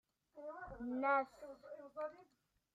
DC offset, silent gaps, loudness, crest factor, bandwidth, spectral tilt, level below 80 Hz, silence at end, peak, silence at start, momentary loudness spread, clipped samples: under 0.1%; none; -42 LUFS; 20 dB; 12 kHz; -6.5 dB/octave; -72 dBFS; 0.5 s; -24 dBFS; 0.35 s; 18 LU; under 0.1%